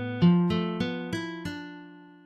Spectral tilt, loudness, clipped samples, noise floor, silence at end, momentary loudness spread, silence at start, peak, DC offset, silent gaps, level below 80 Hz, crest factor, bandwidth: -7.5 dB/octave; -27 LUFS; under 0.1%; -48 dBFS; 0.2 s; 19 LU; 0 s; -12 dBFS; under 0.1%; none; -54 dBFS; 16 dB; 8.8 kHz